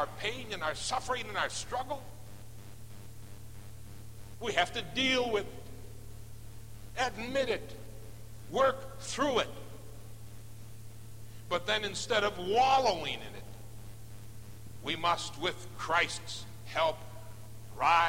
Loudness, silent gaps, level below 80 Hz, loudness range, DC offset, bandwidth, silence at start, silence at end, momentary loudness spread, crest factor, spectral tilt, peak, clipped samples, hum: -32 LUFS; none; -56 dBFS; 6 LU; 0.5%; 16.5 kHz; 0 s; 0 s; 21 LU; 22 dB; -3 dB/octave; -14 dBFS; under 0.1%; none